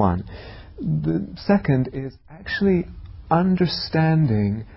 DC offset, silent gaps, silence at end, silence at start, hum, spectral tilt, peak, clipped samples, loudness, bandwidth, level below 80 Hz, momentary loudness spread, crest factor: under 0.1%; none; 0 s; 0 s; none; -11 dB/octave; -6 dBFS; under 0.1%; -22 LUFS; 5.8 kHz; -40 dBFS; 18 LU; 16 dB